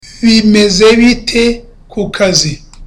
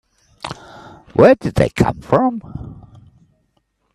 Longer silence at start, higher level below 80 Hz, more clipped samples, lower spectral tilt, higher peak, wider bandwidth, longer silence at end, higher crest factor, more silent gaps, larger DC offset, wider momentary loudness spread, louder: second, 0.05 s vs 0.45 s; first, -30 dBFS vs -40 dBFS; neither; second, -4 dB/octave vs -7.5 dB/octave; about the same, 0 dBFS vs 0 dBFS; about the same, 12.5 kHz vs 13 kHz; second, 0 s vs 1.2 s; second, 10 dB vs 18 dB; neither; neither; second, 13 LU vs 22 LU; first, -9 LUFS vs -15 LUFS